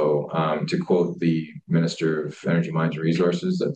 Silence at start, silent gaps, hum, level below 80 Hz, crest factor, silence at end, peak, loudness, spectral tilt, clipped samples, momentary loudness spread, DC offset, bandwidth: 0 s; none; none; -68 dBFS; 14 dB; 0 s; -8 dBFS; -23 LUFS; -7.5 dB/octave; under 0.1%; 4 LU; under 0.1%; 8.6 kHz